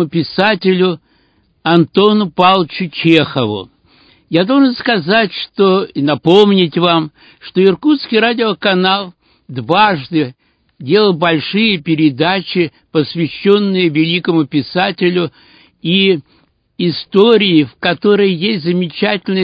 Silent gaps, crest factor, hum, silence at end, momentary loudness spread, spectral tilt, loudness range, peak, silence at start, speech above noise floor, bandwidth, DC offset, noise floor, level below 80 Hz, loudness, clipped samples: none; 14 dB; none; 0 s; 8 LU; -8 dB/octave; 2 LU; 0 dBFS; 0 s; 43 dB; 8 kHz; under 0.1%; -56 dBFS; -56 dBFS; -13 LUFS; under 0.1%